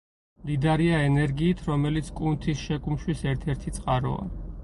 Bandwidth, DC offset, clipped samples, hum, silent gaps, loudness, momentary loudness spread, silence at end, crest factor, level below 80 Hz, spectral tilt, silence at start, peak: 11.5 kHz; under 0.1%; under 0.1%; none; none; -26 LUFS; 9 LU; 0 s; 14 dB; -38 dBFS; -7 dB/octave; 0.4 s; -12 dBFS